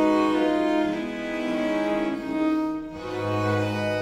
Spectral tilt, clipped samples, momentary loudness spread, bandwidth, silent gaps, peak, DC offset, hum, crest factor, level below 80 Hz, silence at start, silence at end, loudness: -6.5 dB/octave; under 0.1%; 8 LU; 12 kHz; none; -10 dBFS; under 0.1%; none; 14 dB; -54 dBFS; 0 s; 0 s; -25 LUFS